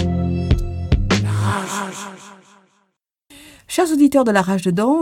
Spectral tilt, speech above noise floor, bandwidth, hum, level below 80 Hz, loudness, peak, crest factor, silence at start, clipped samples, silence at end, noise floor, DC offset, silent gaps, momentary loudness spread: -6 dB/octave; 53 dB; 16.5 kHz; none; -30 dBFS; -18 LUFS; -2 dBFS; 16 dB; 0 s; under 0.1%; 0 s; -69 dBFS; under 0.1%; none; 13 LU